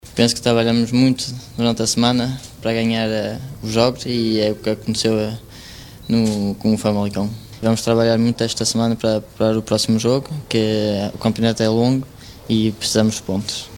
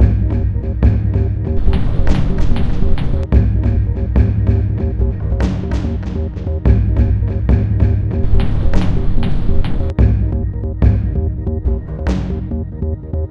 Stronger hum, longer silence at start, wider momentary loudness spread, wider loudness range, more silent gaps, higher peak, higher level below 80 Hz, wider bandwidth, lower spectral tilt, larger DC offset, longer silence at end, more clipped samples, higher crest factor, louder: neither; about the same, 0.05 s vs 0 s; about the same, 9 LU vs 7 LU; about the same, 2 LU vs 1 LU; neither; about the same, 0 dBFS vs 0 dBFS; second, -46 dBFS vs -16 dBFS; first, 17.5 kHz vs 6.4 kHz; second, -5 dB/octave vs -9.5 dB/octave; neither; about the same, 0 s vs 0 s; neither; about the same, 18 dB vs 14 dB; about the same, -19 LUFS vs -17 LUFS